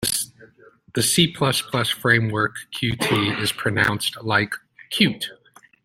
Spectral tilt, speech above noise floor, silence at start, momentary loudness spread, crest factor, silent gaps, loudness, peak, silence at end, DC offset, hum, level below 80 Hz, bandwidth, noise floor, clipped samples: -3.5 dB/octave; 30 dB; 0 s; 11 LU; 22 dB; none; -21 LUFS; -2 dBFS; 0.5 s; under 0.1%; none; -54 dBFS; 16.5 kHz; -51 dBFS; under 0.1%